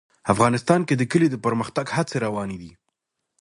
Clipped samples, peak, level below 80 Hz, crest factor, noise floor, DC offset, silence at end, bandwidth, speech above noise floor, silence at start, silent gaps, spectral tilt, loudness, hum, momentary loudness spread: under 0.1%; -2 dBFS; -56 dBFS; 20 dB; -78 dBFS; under 0.1%; 0.7 s; 11.5 kHz; 56 dB; 0.25 s; none; -6 dB/octave; -22 LUFS; none; 9 LU